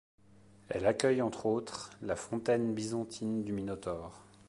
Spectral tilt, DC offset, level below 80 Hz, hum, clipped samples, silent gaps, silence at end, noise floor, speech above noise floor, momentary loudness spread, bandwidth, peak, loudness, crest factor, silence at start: -5.5 dB/octave; under 0.1%; -62 dBFS; none; under 0.1%; none; 0.25 s; -61 dBFS; 27 dB; 11 LU; 11.5 kHz; -10 dBFS; -34 LUFS; 24 dB; 0.7 s